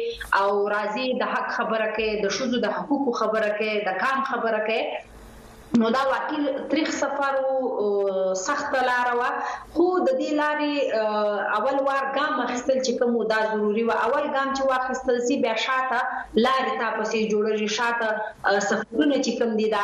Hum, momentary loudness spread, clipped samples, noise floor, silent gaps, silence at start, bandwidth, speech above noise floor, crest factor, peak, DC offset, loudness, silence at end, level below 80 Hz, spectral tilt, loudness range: none; 3 LU; under 0.1%; -45 dBFS; none; 0 s; 13 kHz; 21 dB; 18 dB; -6 dBFS; under 0.1%; -24 LUFS; 0 s; -58 dBFS; -4 dB/octave; 2 LU